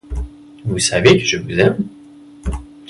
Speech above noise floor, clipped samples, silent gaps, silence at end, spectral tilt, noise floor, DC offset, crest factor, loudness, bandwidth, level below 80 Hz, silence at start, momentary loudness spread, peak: 25 dB; under 0.1%; none; 0.25 s; -4.5 dB/octave; -39 dBFS; under 0.1%; 18 dB; -15 LUFS; 11.5 kHz; -32 dBFS; 0.1 s; 17 LU; 0 dBFS